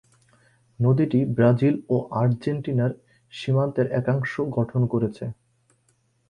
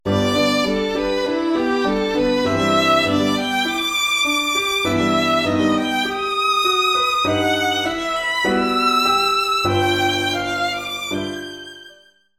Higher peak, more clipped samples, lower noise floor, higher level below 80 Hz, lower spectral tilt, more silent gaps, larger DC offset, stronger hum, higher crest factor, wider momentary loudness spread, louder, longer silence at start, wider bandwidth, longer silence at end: about the same, -6 dBFS vs -4 dBFS; neither; first, -67 dBFS vs -50 dBFS; second, -58 dBFS vs -46 dBFS; first, -9.5 dB/octave vs -3.5 dB/octave; neither; neither; neither; about the same, 18 dB vs 14 dB; first, 10 LU vs 6 LU; second, -23 LUFS vs -18 LUFS; first, 0.8 s vs 0.05 s; second, 7 kHz vs 17 kHz; first, 0.95 s vs 0.5 s